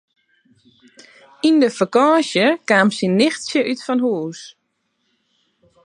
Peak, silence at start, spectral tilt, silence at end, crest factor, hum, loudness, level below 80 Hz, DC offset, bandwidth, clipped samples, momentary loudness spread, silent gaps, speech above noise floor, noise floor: -2 dBFS; 1.45 s; -5 dB/octave; 1.35 s; 18 dB; none; -17 LUFS; -70 dBFS; under 0.1%; 11 kHz; under 0.1%; 7 LU; none; 53 dB; -70 dBFS